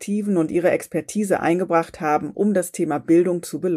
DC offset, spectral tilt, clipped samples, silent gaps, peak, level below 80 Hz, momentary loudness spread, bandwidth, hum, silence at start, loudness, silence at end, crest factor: under 0.1%; -6.5 dB/octave; under 0.1%; none; -6 dBFS; -60 dBFS; 6 LU; 15.5 kHz; none; 0 s; -21 LUFS; 0 s; 14 dB